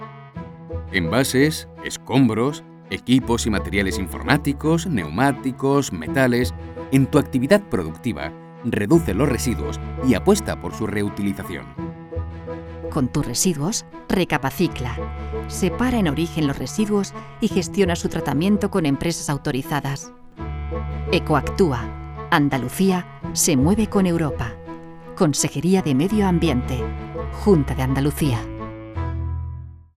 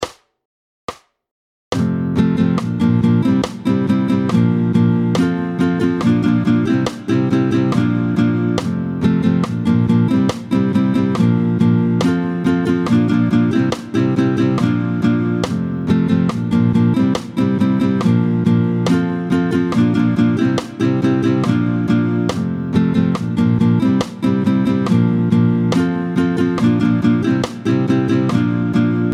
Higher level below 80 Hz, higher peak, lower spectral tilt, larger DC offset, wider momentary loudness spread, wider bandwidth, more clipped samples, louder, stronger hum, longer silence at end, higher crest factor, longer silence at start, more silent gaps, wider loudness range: first, -36 dBFS vs -48 dBFS; about the same, 0 dBFS vs -2 dBFS; second, -5.5 dB/octave vs -8 dB/octave; neither; first, 14 LU vs 4 LU; first, 17.5 kHz vs 11 kHz; neither; second, -21 LUFS vs -16 LUFS; neither; first, 0.25 s vs 0 s; first, 20 dB vs 14 dB; about the same, 0 s vs 0 s; second, none vs 0.45-0.88 s, 1.31-1.71 s; about the same, 3 LU vs 1 LU